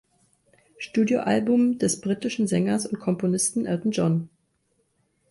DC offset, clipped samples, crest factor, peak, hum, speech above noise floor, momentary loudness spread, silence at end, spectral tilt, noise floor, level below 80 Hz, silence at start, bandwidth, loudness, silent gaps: under 0.1%; under 0.1%; 14 dB; -10 dBFS; none; 47 dB; 6 LU; 1.05 s; -5.5 dB/octave; -70 dBFS; -64 dBFS; 0.8 s; 11.5 kHz; -24 LUFS; none